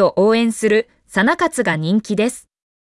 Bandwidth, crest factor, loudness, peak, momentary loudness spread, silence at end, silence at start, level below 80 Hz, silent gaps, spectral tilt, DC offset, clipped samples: 12 kHz; 12 dB; -17 LUFS; -4 dBFS; 6 LU; 0.45 s; 0 s; -58 dBFS; none; -5 dB/octave; under 0.1%; under 0.1%